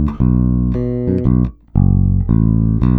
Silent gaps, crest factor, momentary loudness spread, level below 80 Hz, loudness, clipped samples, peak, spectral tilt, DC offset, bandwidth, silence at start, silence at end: none; 14 dB; 4 LU; -20 dBFS; -15 LUFS; under 0.1%; 0 dBFS; -13 dB/octave; under 0.1%; 3.9 kHz; 0 s; 0 s